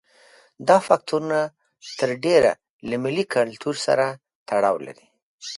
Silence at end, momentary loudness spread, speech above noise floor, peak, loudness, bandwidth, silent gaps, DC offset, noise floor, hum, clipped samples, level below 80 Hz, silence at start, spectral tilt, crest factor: 0 s; 17 LU; 33 dB; 0 dBFS; -22 LUFS; 11.5 kHz; 2.69-2.79 s, 4.35-4.46 s, 5.22-5.39 s; under 0.1%; -54 dBFS; none; under 0.1%; -62 dBFS; 0.6 s; -4.5 dB/octave; 22 dB